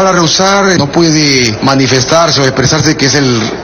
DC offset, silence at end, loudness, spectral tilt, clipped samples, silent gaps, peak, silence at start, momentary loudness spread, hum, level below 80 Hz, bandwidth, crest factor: under 0.1%; 0 s; -8 LUFS; -4 dB/octave; 0.6%; none; 0 dBFS; 0 s; 2 LU; none; -36 dBFS; 15.5 kHz; 8 dB